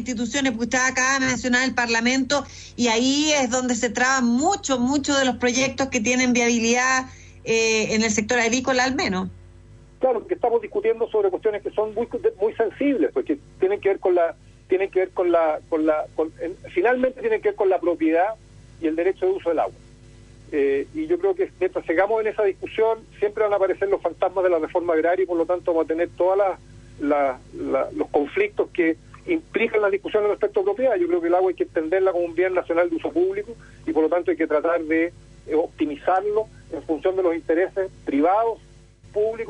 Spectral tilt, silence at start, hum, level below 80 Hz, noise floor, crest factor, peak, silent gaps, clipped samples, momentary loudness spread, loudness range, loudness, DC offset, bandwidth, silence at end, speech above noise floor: -3.5 dB/octave; 0 s; none; -52 dBFS; -47 dBFS; 16 dB; -6 dBFS; none; under 0.1%; 7 LU; 4 LU; -22 LUFS; under 0.1%; 10.5 kHz; 0 s; 25 dB